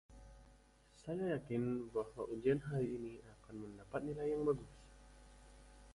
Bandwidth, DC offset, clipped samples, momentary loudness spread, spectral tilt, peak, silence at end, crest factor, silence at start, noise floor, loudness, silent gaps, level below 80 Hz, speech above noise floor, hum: 11.5 kHz; under 0.1%; under 0.1%; 25 LU; -8 dB/octave; -24 dBFS; 0 s; 20 dB; 0.1 s; -66 dBFS; -41 LUFS; none; -64 dBFS; 26 dB; none